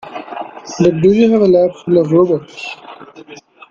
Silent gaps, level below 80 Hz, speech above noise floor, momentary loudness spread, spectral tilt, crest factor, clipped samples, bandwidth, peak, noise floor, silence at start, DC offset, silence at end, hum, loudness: none; -50 dBFS; 26 dB; 17 LU; -7.5 dB/octave; 14 dB; under 0.1%; 7.4 kHz; 0 dBFS; -38 dBFS; 0.05 s; under 0.1%; 0.35 s; none; -12 LUFS